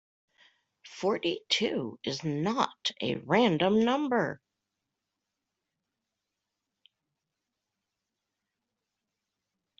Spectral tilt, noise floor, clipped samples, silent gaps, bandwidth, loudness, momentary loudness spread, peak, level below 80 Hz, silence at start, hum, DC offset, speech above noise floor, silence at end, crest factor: -5 dB/octave; -86 dBFS; under 0.1%; none; 8 kHz; -29 LUFS; 9 LU; -10 dBFS; -72 dBFS; 0.85 s; none; under 0.1%; 58 dB; 5.45 s; 22 dB